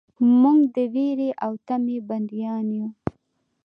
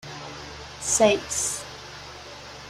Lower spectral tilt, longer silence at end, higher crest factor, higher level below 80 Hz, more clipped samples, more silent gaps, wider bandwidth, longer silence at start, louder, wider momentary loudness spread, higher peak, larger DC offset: first, -10 dB/octave vs -2 dB/octave; first, 0.55 s vs 0 s; second, 16 dB vs 22 dB; second, -58 dBFS vs -52 dBFS; neither; neither; second, 5 kHz vs 16 kHz; first, 0.2 s vs 0.05 s; about the same, -22 LUFS vs -23 LUFS; second, 13 LU vs 20 LU; about the same, -8 dBFS vs -6 dBFS; neither